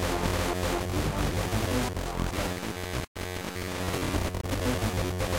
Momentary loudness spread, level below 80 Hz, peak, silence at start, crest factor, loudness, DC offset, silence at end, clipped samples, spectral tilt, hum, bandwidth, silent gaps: 6 LU; -38 dBFS; -12 dBFS; 0 s; 16 dB; -30 LUFS; under 0.1%; 0 s; under 0.1%; -5 dB/octave; none; 17 kHz; 3.07-3.15 s